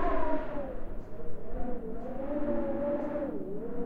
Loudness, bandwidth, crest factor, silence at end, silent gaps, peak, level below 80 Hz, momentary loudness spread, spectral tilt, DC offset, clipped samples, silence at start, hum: -36 LUFS; 3.7 kHz; 14 dB; 0 s; none; -16 dBFS; -40 dBFS; 12 LU; -9.5 dB/octave; under 0.1%; under 0.1%; 0 s; none